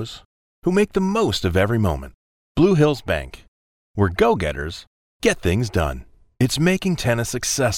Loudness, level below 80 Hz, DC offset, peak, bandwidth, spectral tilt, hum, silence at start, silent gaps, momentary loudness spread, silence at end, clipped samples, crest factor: -20 LUFS; -38 dBFS; under 0.1%; -2 dBFS; 17 kHz; -5 dB/octave; none; 0 s; 0.25-0.62 s, 2.14-2.55 s, 3.48-3.94 s, 4.87-5.20 s; 13 LU; 0 s; under 0.1%; 18 dB